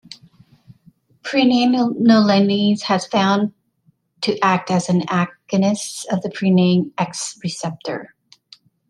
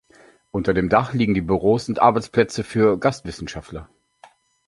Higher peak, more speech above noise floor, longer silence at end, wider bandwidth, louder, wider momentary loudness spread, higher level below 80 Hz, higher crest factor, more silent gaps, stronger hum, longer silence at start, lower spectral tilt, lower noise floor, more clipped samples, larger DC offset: about the same, -2 dBFS vs -2 dBFS; first, 44 dB vs 33 dB; about the same, 0.85 s vs 0.85 s; about the same, 12 kHz vs 11.5 kHz; about the same, -18 LUFS vs -20 LUFS; second, 11 LU vs 15 LU; second, -64 dBFS vs -44 dBFS; about the same, 16 dB vs 20 dB; neither; neither; second, 0.1 s vs 0.55 s; about the same, -5.5 dB/octave vs -6.5 dB/octave; first, -61 dBFS vs -53 dBFS; neither; neither